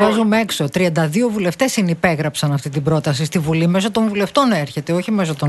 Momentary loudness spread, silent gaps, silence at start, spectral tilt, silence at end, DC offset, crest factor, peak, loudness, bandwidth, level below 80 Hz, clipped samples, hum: 4 LU; none; 0 s; -5.5 dB/octave; 0 s; under 0.1%; 16 dB; -2 dBFS; -17 LUFS; 12.5 kHz; -50 dBFS; under 0.1%; none